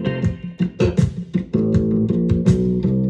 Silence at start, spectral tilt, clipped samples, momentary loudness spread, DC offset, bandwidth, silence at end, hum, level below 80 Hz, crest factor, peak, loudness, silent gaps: 0 s; -9 dB/octave; under 0.1%; 7 LU; under 0.1%; 8.8 kHz; 0 s; none; -36 dBFS; 16 dB; -2 dBFS; -19 LUFS; none